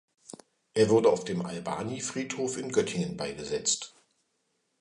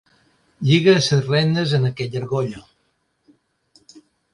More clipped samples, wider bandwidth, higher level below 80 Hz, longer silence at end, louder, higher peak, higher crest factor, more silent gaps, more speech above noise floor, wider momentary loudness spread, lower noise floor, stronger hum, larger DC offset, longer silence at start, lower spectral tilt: neither; about the same, 11 kHz vs 11.5 kHz; second, -64 dBFS vs -56 dBFS; first, 0.95 s vs 0.35 s; second, -29 LUFS vs -19 LUFS; second, -12 dBFS vs -2 dBFS; about the same, 20 dB vs 18 dB; neither; about the same, 48 dB vs 50 dB; first, 15 LU vs 12 LU; first, -76 dBFS vs -68 dBFS; neither; neither; second, 0.3 s vs 0.6 s; second, -4 dB/octave vs -6 dB/octave